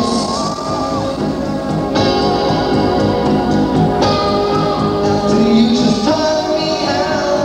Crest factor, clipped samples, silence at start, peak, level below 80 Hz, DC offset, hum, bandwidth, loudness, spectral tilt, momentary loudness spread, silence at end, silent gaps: 12 dB; under 0.1%; 0 s; -2 dBFS; -34 dBFS; under 0.1%; none; 11 kHz; -15 LUFS; -5.5 dB/octave; 6 LU; 0 s; none